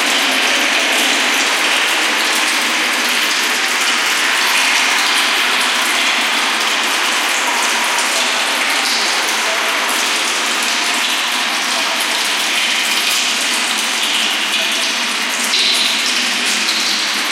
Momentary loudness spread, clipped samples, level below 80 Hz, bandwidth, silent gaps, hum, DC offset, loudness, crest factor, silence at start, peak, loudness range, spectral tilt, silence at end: 3 LU; under 0.1%; -72 dBFS; 17 kHz; none; none; under 0.1%; -13 LUFS; 14 dB; 0 s; -2 dBFS; 2 LU; 1.5 dB/octave; 0 s